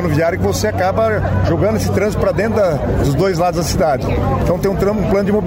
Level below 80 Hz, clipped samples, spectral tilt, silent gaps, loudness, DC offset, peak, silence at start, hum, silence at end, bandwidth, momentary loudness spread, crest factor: -28 dBFS; under 0.1%; -6.5 dB/octave; none; -16 LUFS; under 0.1%; -4 dBFS; 0 s; none; 0 s; 16.5 kHz; 2 LU; 12 dB